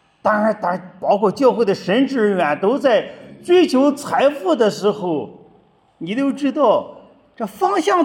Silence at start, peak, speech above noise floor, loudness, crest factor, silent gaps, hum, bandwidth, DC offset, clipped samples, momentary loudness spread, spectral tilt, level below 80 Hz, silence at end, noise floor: 0.25 s; -2 dBFS; 37 dB; -17 LUFS; 16 dB; none; none; 16.5 kHz; under 0.1%; under 0.1%; 10 LU; -5.5 dB/octave; -68 dBFS; 0 s; -54 dBFS